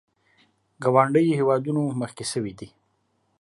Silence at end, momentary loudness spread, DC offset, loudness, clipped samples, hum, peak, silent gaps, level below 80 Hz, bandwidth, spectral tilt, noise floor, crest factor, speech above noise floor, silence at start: 0.75 s; 12 LU; under 0.1%; -23 LUFS; under 0.1%; none; -4 dBFS; none; -66 dBFS; 11.5 kHz; -6.5 dB/octave; -70 dBFS; 20 dB; 48 dB; 0.8 s